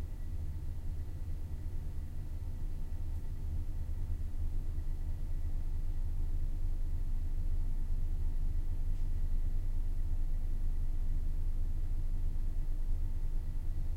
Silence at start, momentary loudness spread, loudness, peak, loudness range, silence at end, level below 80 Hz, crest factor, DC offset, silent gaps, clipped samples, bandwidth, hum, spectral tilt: 0 s; 4 LU; -41 LUFS; -22 dBFS; 3 LU; 0 s; -34 dBFS; 10 dB; under 0.1%; none; under 0.1%; 2.1 kHz; none; -7.5 dB/octave